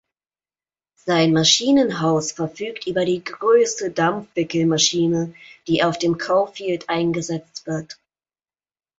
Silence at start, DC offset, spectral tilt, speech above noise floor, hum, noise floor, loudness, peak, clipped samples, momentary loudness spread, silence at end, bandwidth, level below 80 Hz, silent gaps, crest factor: 1.05 s; under 0.1%; -4 dB/octave; over 70 dB; none; under -90 dBFS; -20 LUFS; -2 dBFS; under 0.1%; 13 LU; 1.05 s; 8 kHz; -60 dBFS; none; 20 dB